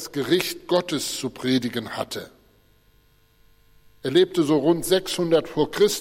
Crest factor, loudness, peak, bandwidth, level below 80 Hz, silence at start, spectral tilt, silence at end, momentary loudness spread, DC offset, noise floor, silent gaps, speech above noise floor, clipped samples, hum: 16 dB; -23 LUFS; -6 dBFS; 16.5 kHz; -56 dBFS; 0 s; -4.5 dB/octave; 0 s; 10 LU; under 0.1%; -59 dBFS; none; 37 dB; under 0.1%; none